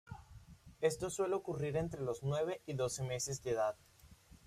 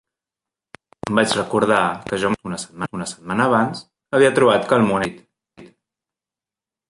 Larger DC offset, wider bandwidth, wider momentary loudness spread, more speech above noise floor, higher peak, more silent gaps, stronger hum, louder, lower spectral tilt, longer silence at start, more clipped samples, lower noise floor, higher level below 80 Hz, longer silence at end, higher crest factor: neither; first, 15.5 kHz vs 11.5 kHz; first, 18 LU vs 13 LU; second, 24 dB vs 71 dB; second, -20 dBFS vs -2 dBFS; neither; neither; second, -38 LUFS vs -19 LUFS; about the same, -5 dB/octave vs -5 dB/octave; second, 0.05 s vs 1.05 s; neither; second, -61 dBFS vs -90 dBFS; second, -62 dBFS vs -56 dBFS; second, 0.35 s vs 1.25 s; about the same, 20 dB vs 20 dB